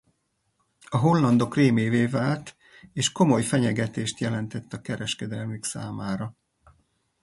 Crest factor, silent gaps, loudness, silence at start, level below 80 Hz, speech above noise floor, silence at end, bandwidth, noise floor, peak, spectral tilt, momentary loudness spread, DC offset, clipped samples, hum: 18 dB; none; -25 LUFS; 0.9 s; -60 dBFS; 49 dB; 0.9 s; 11.5 kHz; -73 dBFS; -6 dBFS; -5.5 dB/octave; 13 LU; under 0.1%; under 0.1%; none